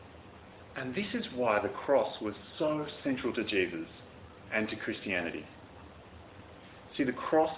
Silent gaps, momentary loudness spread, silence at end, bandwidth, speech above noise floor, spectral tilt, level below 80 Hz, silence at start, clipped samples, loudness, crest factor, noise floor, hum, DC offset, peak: none; 22 LU; 0 s; 4 kHz; 20 dB; -3.5 dB/octave; -62 dBFS; 0 s; under 0.1%; -33 LUFS; 20 dB; -52 dBFS; none; under 0.1%; -14 dBFS